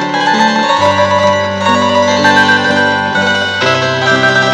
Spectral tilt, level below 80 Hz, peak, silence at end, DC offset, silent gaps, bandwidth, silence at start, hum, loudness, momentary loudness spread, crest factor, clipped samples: -4 dB/octave; -54 dBFS; 0 dBFS; 0 s; under 0.1%; none; 11.5 kHz; 0 s; none; -10 LUFS; 4 LU; 10 dB; 0.1%